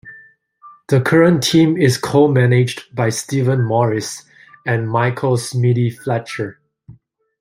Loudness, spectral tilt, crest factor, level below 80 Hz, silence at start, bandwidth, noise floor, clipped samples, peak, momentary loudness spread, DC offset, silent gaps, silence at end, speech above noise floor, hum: -16 LUFS; -6 dB/octave; 16 dB; -56 dBFS; 0.05 s; 16 kHz; -48 dBFS; under 0.1%; -2 dBFS; 12 LU; under 0.1%; none; 0.5 s; 33 dB; none